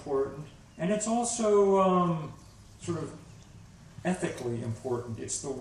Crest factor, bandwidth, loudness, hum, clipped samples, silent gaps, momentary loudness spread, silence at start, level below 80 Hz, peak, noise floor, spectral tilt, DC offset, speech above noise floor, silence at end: 16 dB; 12 kHz; -29 LUFS; none; under 0.1%; none; 19 LU; 0 s; -58 dBFS; -14 dBFS; -51 dBFS; -5.5 dB/octave; under 0.1%; 22 dB; 0 s